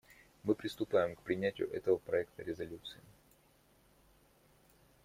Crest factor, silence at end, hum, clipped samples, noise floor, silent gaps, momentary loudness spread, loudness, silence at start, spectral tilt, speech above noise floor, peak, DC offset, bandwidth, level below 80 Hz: 20 dB; 2.1 s; none; under 0.1%; -68 dBFS; none; 12 LU; -37 LUFS; 0.45 s; -6.5 dB/octave; 32 dB; -18 dBFS; under 0.1%; 16 kHz; -70 dBFS